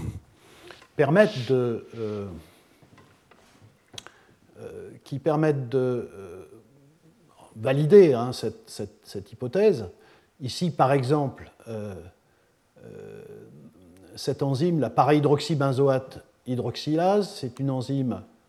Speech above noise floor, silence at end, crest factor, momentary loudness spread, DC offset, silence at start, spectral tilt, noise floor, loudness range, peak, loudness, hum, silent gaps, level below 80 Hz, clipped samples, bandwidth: 40 dB; 0.25 s; 22 dB; 23 LU; under 0.1%; 0 s; -7 dB/octave; -64 dBFS; 10 LU; -4 dBFS; -24 LUFS; none; none; -62 dBFS; under 0.1%; 13 kHz